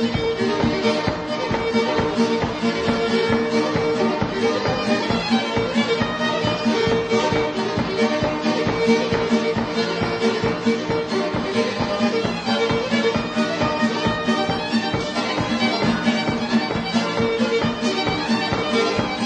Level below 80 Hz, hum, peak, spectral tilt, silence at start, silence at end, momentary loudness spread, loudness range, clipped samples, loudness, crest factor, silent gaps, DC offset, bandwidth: -44 dBFS; none; -6 dBFS; -5 dB/octave; 0 s; 0 s; 3 LU; 1 LU; under 0.1%; -21 LUFS; 16 dB; none; under 0.1%; 9.6 kHz